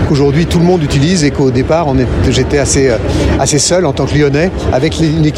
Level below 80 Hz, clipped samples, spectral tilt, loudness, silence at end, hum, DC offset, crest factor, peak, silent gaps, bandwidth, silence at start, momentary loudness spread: -24 dBFS; under 0.1%; -5.5 dB/octave; -11 LUFS; 0 s; none; under 0.1%; 10 dB; 0 dBFS; none; 13 kHz; 0 s; 3 LU